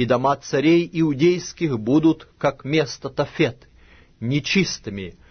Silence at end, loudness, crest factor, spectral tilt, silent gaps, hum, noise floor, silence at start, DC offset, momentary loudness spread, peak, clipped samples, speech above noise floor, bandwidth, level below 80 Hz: 0.2 s; -21 LUFS; 16 dB; -5.5 dB/octave; none; none; -50 dBFS; 0 s; under 0.1%; 8 LU; -4 dBFS; under 0.1%; 30 dB; 6.6 kHz; -52 dBFS